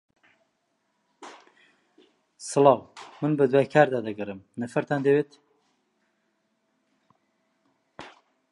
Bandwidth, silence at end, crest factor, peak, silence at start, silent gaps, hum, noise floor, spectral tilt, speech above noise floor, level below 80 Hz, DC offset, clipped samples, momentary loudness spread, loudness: 11.5 kHz; 0.45 s; 24 dB; -4 dBFS; 1.2 s; none; none; -74 dBFS; -6 dB/octave; 51 dB; -74 dBFS; under 0.1%; under 0.1%; 26 LU; -24 LUFS